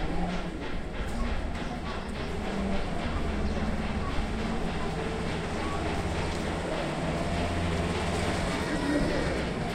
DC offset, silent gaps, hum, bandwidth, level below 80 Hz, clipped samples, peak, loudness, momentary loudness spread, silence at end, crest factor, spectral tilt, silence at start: under 0.1%; none; none; 14 kHz; -36 dBFS; under 0.1%; -14 dBFS; -31 LUFS; 6 LU; 0 s; 14 dB; -5.5 dB/octave; 0 s